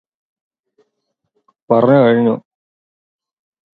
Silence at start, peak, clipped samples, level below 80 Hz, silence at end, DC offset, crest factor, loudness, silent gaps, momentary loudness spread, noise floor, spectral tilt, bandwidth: 1.7 s; 0 dBFS; under 0.1%; -64 dBFS; 1.4 s; under 0.1%; 18 dB; -13 LUFS; none; 8 LU; -73 dBFS; -10 dB/octave; 4.4 kHz